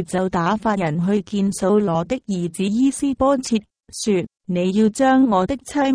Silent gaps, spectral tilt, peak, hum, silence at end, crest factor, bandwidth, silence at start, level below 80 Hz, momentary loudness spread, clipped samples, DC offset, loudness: none; -6 dB/octave; -4 dBFS; none; 0 s; 14 dB; 11 kHz; 0 s; -48 dBFS; 8 LU; under 0.1%; under 0.1%; -20 LUFS